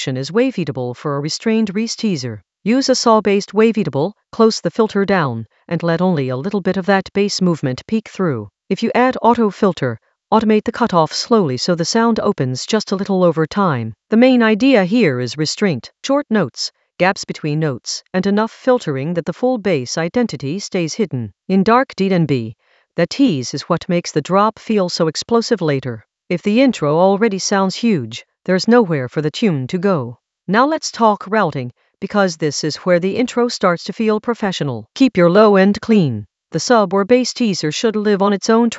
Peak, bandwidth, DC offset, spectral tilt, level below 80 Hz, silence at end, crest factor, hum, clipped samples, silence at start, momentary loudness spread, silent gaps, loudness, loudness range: 0 dBFS; 8.2 kHz; under 0.1%; -5.5 dB/octave; -56 dBFS; 0 s; 16 dB; none; under 0.1%; 0 s; 9 LU; none; -16 LUFS; 4 LU